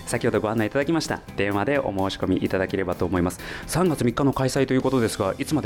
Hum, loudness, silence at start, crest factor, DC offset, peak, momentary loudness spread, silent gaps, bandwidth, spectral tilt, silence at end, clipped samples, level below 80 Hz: none; -24 LUFS; 0 s; 12 dB; under 0.1%; -10 dBFS; 4 LU; none; 18 kHz; -5.5 dB/octave; 0 s; under 0.1%; -46 dBFS